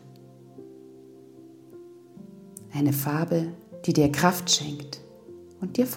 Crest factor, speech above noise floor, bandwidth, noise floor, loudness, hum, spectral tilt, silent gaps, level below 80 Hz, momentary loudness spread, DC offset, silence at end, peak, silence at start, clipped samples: 24 dB; 25 dB; 17 kHz; -49 dBFS; -25 LUFS; none; -4.5 dB/octave; none; -60 dBFS; 25 LU; under 0.1%; 0 s; -4 dBFS; 0.05 s; under 0.1%